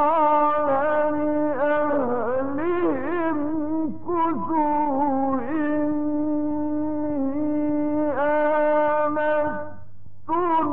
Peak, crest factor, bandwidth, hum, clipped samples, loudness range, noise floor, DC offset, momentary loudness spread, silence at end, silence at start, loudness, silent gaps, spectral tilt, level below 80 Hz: -12 dBFS; 10 dB; 3.8 kHz; none; under 0.1%; 1 LU; -48 dBFS; 3%; 6 LU; 0 s; 0 s; -23 LUFS; none; -10 dB/octave; -56 dBFS